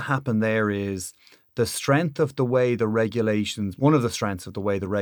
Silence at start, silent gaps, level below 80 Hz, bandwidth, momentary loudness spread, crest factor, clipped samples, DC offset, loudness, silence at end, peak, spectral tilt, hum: 0 s; none; -58 dBFS; 19.5 kHz; 8 LU; 16 dB; under 0.1%; under 0.1%; -24 LUFS; 0 s; -8 dBFS; -6 dB/octave; none